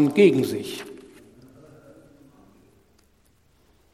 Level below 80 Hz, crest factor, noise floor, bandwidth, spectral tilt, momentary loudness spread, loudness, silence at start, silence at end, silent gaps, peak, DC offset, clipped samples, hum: -64 dBFS; 22 dB; -62 dBFS; 14.5 kHz; -6.5 dB/octave; 25 LU; -21 LUFS; 0 s; 2.95 s; none; -4 dBFS; under 0.1%; under 0.1%; none